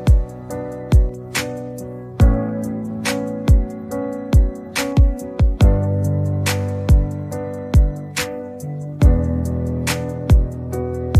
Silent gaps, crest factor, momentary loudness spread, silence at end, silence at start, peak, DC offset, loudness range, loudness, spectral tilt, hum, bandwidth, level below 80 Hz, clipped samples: none; 16 dB; 12 LU; 0 s; 0 s; -2 dBFS; under 0.1%; 2 LU; -20 LUFS; -6.5 dB/octave; none; 15 kHz; -20 dBFS; under 0.1%